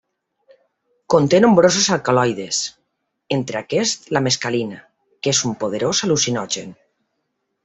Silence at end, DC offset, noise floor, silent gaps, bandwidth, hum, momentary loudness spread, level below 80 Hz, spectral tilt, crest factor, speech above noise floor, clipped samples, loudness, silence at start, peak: 0.9 s; under 0.1%; -73 dBFS; none; 8.4 kHz; none; 12 LU; -58 dBFS; -3.5 dB/octave; 20 dB; 56 dB; under 0.1%; -18 LUFS; 1.1 s; 0 dBFS